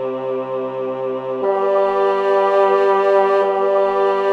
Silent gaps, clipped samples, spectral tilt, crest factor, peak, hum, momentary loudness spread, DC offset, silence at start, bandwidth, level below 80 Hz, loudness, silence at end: none; under 0.1%; -6 dB/octave; 14 dB; -2 dBFS; none; 9 LU; under 0.1%; 0 s; 6.4 kHz; -60 dBFS; -17 LUFS; 0 s